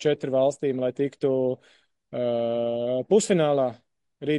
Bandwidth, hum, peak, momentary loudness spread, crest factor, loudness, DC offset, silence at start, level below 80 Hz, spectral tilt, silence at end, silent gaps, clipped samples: 11.5 kHz; none; -8 dBFS; 8 LU; 16 dB; -25 LUFS; under 0.1%; 0 s; -70 dBFS; -5.5 dB/octave; 0 s; none; under 0.1%